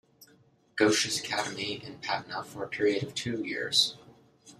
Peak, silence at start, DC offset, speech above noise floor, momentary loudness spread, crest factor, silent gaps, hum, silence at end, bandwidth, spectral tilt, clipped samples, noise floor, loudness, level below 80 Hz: -10 dBFS; 0.2 s; under 0.1%; 33 dB; 12 LU; 20 dB; none; none; 0.05 s; 14 kHz; -2.5 dB/octave; under 0.1%; -63 dBFS; -29 LUFS; -70 dBFS